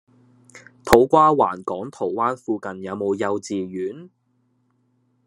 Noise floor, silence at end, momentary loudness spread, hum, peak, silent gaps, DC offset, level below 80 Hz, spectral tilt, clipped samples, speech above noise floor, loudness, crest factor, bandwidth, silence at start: -66 dBFS; 1.2 s; 15 LU; none; 0 dBFS; none; under 0.1%; -48 dBFS; -5.5 dB/octave; under 0.1%; 46 dB; -21 LUFS; 22 dB; 13 kHz; 0.55 s